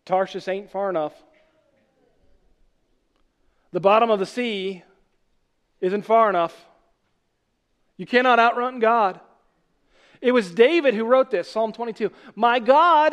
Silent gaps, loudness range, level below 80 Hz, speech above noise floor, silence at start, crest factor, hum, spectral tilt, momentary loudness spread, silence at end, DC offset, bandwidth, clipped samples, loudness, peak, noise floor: none; 7 LU; -70 dBFS; 52 dB; 0.1 s; 20 dB; none; -5.5 dB/octave; 12 LU; 0 s; under 0.1%; 11 kHz; under 0.1%; -21 LUFS; -2 dBFS; -72 dBFS